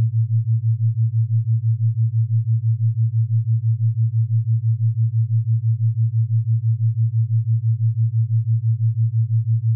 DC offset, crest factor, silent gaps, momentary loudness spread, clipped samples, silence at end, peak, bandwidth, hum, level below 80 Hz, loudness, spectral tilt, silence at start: under 0.1%; 6 dB; none; 1 LU; under 0.1%; 0 s; -12 dBFS; 0.2 kHz; none; -64 dBFS; -20 LUFS; -29.5 dB/octave; 0 s